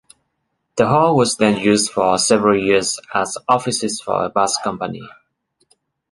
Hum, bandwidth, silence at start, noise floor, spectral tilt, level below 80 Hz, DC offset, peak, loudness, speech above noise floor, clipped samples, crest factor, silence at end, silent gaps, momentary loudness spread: none; 11.5 kHz; 0.75 s; -72 dBFS; -4 dB/octave; -54 dBFS; under 0.1%; 0 dBFS; -17 LUFS; 55 dB; under 0.1%; 18 dB; 1 s; none; 9 LU